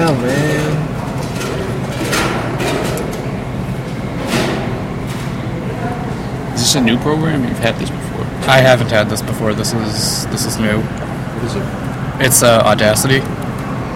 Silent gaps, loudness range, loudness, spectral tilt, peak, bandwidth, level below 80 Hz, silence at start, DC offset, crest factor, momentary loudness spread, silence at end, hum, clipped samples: none; 6 LU; -16 LUFS; -4.5 dB/octave; 0 dBFS; 16.5 kHz; -34 dBFS; 0 s; under 0.1%; 16 dB; 11 LU; 0 s; none; under 0.1%